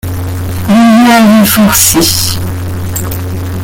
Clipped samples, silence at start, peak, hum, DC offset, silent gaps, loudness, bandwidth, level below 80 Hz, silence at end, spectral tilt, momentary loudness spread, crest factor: 0.2%; 0.05 s; 0 dBFS; none; under 0.1%; none; -8 LUFS; over 20 kHz; -30 dBFS; 0 s; -4 dB/octave; 13 LU; 8 dB